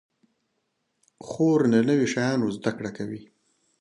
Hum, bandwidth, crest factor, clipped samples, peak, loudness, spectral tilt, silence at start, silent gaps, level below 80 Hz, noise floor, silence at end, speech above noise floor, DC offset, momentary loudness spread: none; 10.5 kHz; 18 dB; under 0.1%; -8 dBFS; -24 LUFS; -6.5 dB/octave; 1.25 s; none; -66 dBFS; -76 dBFS; 0.6 s; 52 dB; under 0.1%; 15 LU